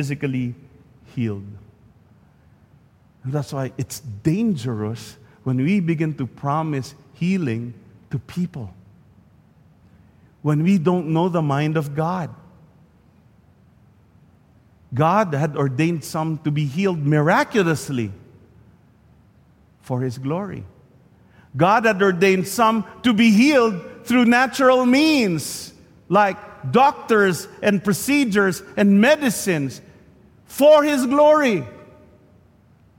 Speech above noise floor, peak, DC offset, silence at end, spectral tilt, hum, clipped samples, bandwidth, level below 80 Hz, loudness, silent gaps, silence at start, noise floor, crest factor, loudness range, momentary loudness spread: 35 dB; -4 dBFS; under 0.1%; 1.2 s; -6 dB/octave; none; under 0.1%; 16.5 kHz; -58 dBFS; -19 LUFS; none; 0 s; -54 dBFS; 16 dB; 13 LU; 16 LU